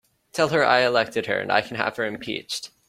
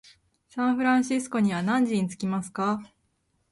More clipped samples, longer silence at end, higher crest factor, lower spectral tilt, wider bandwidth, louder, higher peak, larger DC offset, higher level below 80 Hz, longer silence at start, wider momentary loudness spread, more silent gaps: neither; second, 0.2 s vs 0.65 s; first, 20 dB vs 14 dB; second, -4 dB/octave vs -5.5 dB/octave; first, 16 kHz vs 11.5 kHz; first, -23 LUFS vs -26 LUFS; first, -2 dBFS vs -12 dBFS; neither; about the same, -64 dBFS vs -66 dBFS; second, 0.35 s vs 0.55 s; first, 12 LU vs 7 LU; neither